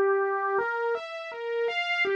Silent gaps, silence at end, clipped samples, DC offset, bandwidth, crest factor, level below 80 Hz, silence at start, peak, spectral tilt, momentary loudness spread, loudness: none; 0 s; under 0.1%; under 0.1%; 7.6 kHz; 12 dB; -78 dBFS; 0 s; -16 dBFS; -3 dB/octave; 8 LU; -28 LUFS